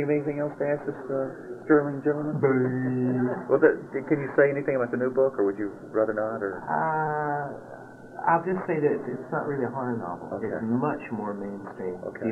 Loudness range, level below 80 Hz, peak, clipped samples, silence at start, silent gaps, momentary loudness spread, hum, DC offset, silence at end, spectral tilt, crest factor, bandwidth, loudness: 5 LU; -66 dBFS; -6 dBFS; under 0.1%; 0 s; none; 11 LU; none; under 0.1%; 0 s; -10 dB/octave; 20 dB; 6.6 kHz; -27 LUFS